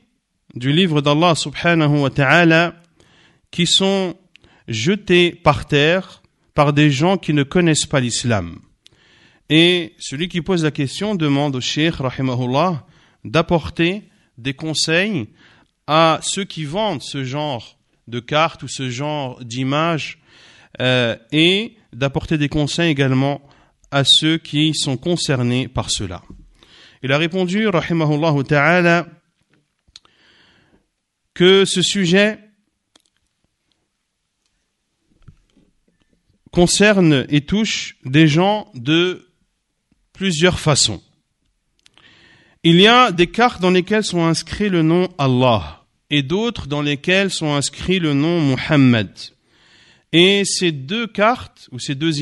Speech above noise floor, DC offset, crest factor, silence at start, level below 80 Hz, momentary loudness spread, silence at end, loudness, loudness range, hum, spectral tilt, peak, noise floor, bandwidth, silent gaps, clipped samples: 56 dB; under 0.1%; 18 dB; 0.55 s; -46 dBFS; 12 LU; 0 s; -17 LUFS; 5 LU; none; -4.5 dB/octave; 0 dBFS; -73 dBFS; 11.5 kHz; none; under 0.1%